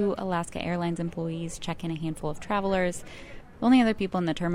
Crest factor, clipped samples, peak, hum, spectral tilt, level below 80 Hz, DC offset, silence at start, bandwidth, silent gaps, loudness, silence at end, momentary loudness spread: 18 dB; under 0.1%; -10 dBFS; none; -6 dB/octave; -48 dBFS; under 0.1%; 0 s; 13 kHz; none; -28 LUFS; 0 s; 13 LU